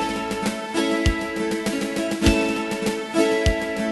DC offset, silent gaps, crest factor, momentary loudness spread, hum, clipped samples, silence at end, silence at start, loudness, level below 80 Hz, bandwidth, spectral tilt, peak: under 0.1%; none; 18 dB; 6 LU; none; under 0.1%; 0 s; 0 s; -23 LUFS; -32 dBFS; 12.5 kHz; -5 dB/octave; -4 dBFS